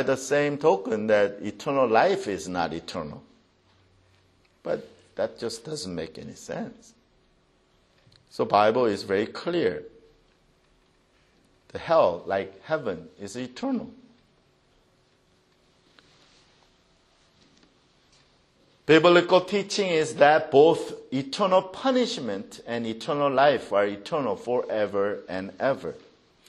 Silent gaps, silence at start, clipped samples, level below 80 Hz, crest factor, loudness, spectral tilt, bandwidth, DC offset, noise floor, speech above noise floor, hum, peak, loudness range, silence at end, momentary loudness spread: none; 0 s; under 0.1%; -66 dBFS; 22 dB; -25 LUFS; -5 dB/octave; 12.5 kHz; under 0.1%; -64 dBFS; 40 dB; none; -4 dBFS; 14 LU; 0.5 s; 17 LU